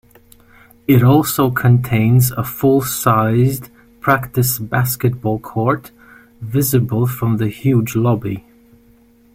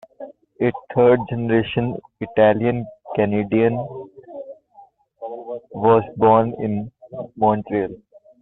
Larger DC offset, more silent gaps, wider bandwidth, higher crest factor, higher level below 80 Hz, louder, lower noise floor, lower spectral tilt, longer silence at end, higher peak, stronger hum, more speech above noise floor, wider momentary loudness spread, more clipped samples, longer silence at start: neither; neither; first, 16.5 kHz vs 4 kHz; about the same, 16 dB vs 18 dB; first, -46 dBFS vs -54 dBFS; first, -16 LUFS vs -19 LUFS; about the same, -50 dBFS vs -50 dBFS; second, -6.5 dB/octave vs -11 dB/octave; first, 0.95 s vs 0.45 s; about the same, -2 dBFS vs -2 dBFS; neither; about the same, 35 dB vs 32 dB; second, 9 LU vs 21 LU; neither; first, 0.9 s vs 0.2 s